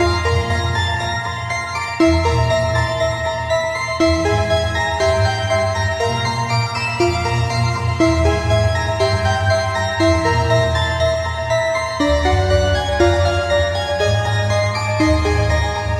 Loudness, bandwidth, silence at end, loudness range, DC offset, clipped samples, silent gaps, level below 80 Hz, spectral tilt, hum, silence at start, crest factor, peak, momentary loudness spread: -17 LUFS; 13 kHz; 0 s; 1 LU; under 0.1%; under 0.1%; none; -28 dBFS; -5.5 dB/octave; none; 0 s; 16 dB; -2 dBFS; 4 LU